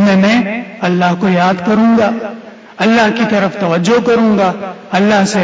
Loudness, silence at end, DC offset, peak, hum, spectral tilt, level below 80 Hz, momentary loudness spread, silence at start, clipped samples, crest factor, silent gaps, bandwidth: -12 LUFS; 0 s; under 0.1%; -2 dBFS; none; -6 dB/octave; -50 dBFS; 8 LU; 0 s; under 0.1%; 10 dB; none; 8 kHz